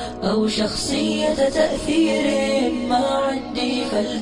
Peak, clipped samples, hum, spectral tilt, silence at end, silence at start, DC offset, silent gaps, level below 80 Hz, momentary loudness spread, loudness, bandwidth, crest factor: -4 dBFS; under 0.1%; none; -4 dB/octave; 0 s; 0 s; under 0.1%; none; -42 dBFS; 4 LU; -20 LUFS; 14.5 kHz; 16 dB